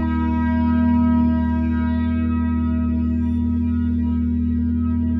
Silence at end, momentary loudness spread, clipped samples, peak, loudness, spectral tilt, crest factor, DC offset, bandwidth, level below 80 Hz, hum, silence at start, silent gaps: 0 s; 4 LU; under 0.1%; -8 dBFS; -20 LUFS; -11 dB/octave; 10 dB; under 0.1%; 4.1 kHz; -26 dBFS; none; 0 s; none